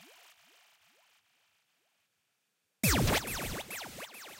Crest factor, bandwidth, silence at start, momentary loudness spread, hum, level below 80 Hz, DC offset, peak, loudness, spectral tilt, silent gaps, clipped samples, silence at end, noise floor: 22 dB; 16 kHz; 0 s; 15 LU; none; -48 dBFS; under 0.1%; -16 dBFS; -32 LUFS; -3.5 dB/octave; none; under 0.1%; 0 s; -81 dBFS